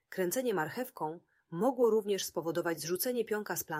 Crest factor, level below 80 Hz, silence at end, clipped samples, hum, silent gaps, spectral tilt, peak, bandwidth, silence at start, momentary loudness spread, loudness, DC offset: 16 dB; -78 dBFS; 0 s; under 0.1%; none; none; -4 dB/octave; -18 dBFS; 16 kHz; 0.1 s; 11 LU; -33 LUFS; under 0.1%